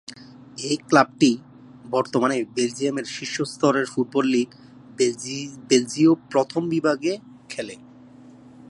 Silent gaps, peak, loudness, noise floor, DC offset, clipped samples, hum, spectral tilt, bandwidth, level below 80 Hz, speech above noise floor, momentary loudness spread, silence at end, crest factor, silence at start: none; -2 dBFS; -23 LUFS; -47 dBFS; under 0.1%; under 0.1%; none; -4.5 dB/octave; 11.5 kHz; -68 dBFS; 25 dB; 14 LU; 0.05 s; 22 dB; 0.1 s